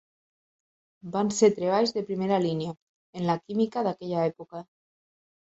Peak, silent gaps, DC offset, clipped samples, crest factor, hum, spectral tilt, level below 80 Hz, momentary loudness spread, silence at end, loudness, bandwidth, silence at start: -8 dBFS; 2.82-3.13 s; under 0.1%; under 0.1%; 20 dB; none; -5.5 dB/octave; -70 dBFS; 20 LU; 0.8 s; -27 LUFS; 8.2 kHz; 1.05 s